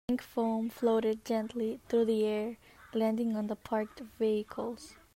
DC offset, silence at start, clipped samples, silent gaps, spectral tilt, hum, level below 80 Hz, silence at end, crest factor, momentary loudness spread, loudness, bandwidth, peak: under 0.1%; 0.1 s; under 0.1%; none; -6.5 dB/octave; none; -66 dBFS; 0.2 s; 14 dB; 10 LU; -33 LUFS; 16 kHz; -18 dBFS